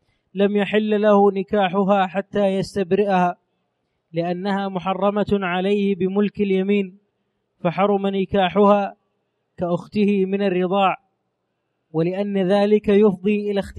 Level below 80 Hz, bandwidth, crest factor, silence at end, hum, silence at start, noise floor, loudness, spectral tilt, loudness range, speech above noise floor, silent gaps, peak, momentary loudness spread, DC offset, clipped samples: -54 dBFS; 9.8 kHz; 16 dB; 0 s; none; 0.35 s; -74 dBFS; -20 LUFS; -8 dB/octave; 3 LU; 55 dB; none; -4 dBFS; 9 LU; under 0.1%; under 0.1%